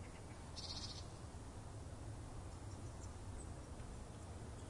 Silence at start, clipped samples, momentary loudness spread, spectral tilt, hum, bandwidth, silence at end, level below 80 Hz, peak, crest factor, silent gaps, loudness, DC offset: 0 s; under 0.1%; 6 LU; -4.5 dB/octave; none; 11.5 kHz; 0 s; -56 dBFS; -36 dBFS; 16 dB; none; -52 LUFS; under 0.1%